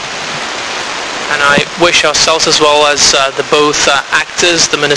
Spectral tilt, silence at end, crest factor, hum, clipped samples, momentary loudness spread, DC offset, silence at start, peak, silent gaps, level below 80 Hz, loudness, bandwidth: -1 dB/octave; 0 s; 10 dB; none; 0.4%; 10 LU; under 0.1%; 0 s; 0 dBFS; none; -40 dBFS; -9 LUFS; 11 kHz